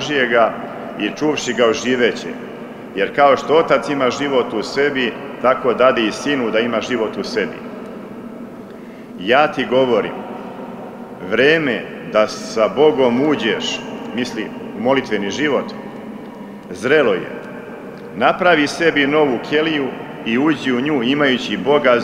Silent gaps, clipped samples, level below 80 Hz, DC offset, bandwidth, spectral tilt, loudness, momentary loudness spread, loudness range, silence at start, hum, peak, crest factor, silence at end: none; under 0.1%; -56 dBFS; under 0.1%; 13 kHz; -4.5 dB/octave; -17 LUFS; 18 LU; 4 LU; 0 s; none; -2 dBFS; 16 dB; 0 s